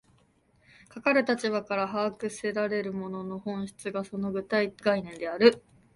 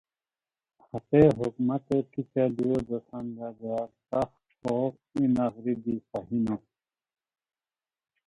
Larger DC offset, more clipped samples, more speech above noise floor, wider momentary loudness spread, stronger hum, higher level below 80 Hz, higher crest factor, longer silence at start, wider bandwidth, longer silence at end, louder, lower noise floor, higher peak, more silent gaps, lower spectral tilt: neither; neither; second, 37 dB vs over 62 dB; about the same, 13 LU vs 15 LU; neither; second, -68 dBFS vs -58 dBFS; about the same, 24 dB vs 22 dB; about the same, 0.95 s vs 0.95 s; about the same, 11.5 kHz vs 10.5 kHz; second, 0.35 s vs 1.7 s; about the same, -28 LUFS vs -29 LUFS; second, -65 dBFS vs under -90 dBFS; about the same, -4 dBFS vs -6 dBFS; neither; second, -5.5 dB/octave vs -9.5 dB/octave